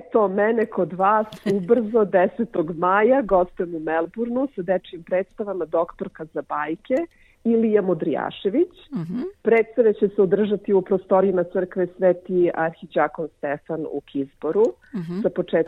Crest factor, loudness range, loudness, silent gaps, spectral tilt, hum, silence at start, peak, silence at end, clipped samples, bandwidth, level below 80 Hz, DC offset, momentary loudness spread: 16 dB; 5 LU; -22 LUFS; none; -8.5 dB/octave; none; 0.05 s; -6 dBFS; 0 s; under 0.1%; 7.2 kHz; -56 dBFS; under 0.1%; 10 LU